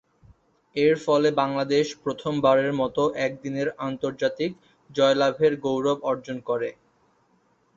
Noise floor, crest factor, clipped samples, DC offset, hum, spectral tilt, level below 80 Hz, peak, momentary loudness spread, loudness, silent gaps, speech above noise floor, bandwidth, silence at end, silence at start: -65 dBFS; 18 dB; under 0.1%; under 0.1%; none; -5.5 dB/octave; -62 dBFS; -6 dBFS; 9 LU; -24 LUFS; none; 42 dB; 7.6 kHz; 1.05 s; 0.75 s